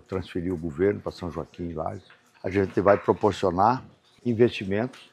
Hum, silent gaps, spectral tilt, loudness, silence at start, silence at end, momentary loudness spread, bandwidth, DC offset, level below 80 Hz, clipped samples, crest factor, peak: none; none; -7.5 dB/octave; -26 LUFS; 0.1 s; 0.1 s; 13 LU; 10.5 kHz; under 0.1%; -56 dBFS; under 0.1%; 22 dB; -4 dBFS